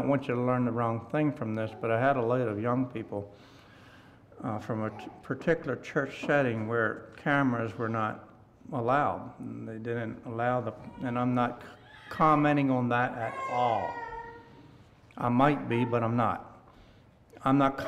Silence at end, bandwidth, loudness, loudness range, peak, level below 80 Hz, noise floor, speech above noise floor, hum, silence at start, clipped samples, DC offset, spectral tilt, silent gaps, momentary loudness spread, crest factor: 0 s; 9.6 kHz; -30 LUFS; 5 LU; -12 dBFS; -62 dBFS; -57 dBFS; 28 dB; none; 0 s; under 0.1%; under 0.1%; -8 dB/octave; none; 14 LU; 18 dB